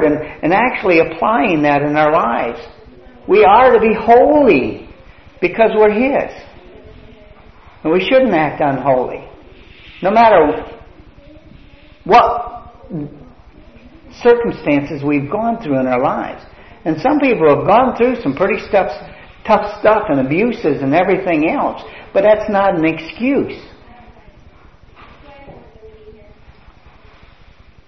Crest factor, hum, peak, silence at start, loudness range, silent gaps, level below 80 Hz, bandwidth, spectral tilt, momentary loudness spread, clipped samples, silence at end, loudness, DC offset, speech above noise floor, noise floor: 16 dB; none; 0 dBFS; 0 s; 6 LU; none; -44 dBFS; 6.2 kHz; -7.5 dB/octave; 17 LU; under 0.1%; 1.75 s; -14 LUFS; 0.4%; 32 dB; -45 dBFS